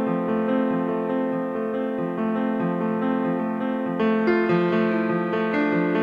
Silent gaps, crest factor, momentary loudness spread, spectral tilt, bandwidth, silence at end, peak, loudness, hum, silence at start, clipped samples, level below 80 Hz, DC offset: none; 14 dB; 5 LU; -9 dB/octave; 5.4 kHz; 0 s; -10 dBFS; -23 LUFS; none; 0 s; under 0.1%; -66 dBFS; under 0.1%